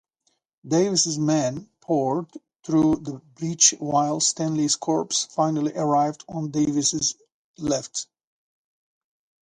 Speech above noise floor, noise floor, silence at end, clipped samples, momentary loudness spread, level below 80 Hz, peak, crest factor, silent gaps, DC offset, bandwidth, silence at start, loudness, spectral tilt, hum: 49 dB; -72 dBFS; 1.45 s; under 0.1%; 13 LU; -60 dBFS; -2 dBFS; 24 dB; 7.32-7.54 s; under 0.1%; 10.5 kHz; 0.65 s; -23 LUFS; -4 dB/octave; none